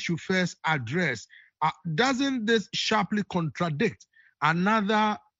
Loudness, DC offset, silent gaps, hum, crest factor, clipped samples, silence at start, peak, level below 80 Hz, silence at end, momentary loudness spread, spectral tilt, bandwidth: -26 LUFS; under 0.1%; none; none; 18 dB; under 0.1%; 0 s; -8 dBFS; -66 dBFS; 0.25 s; 6 LU; -5 dB/octave; 8 kHz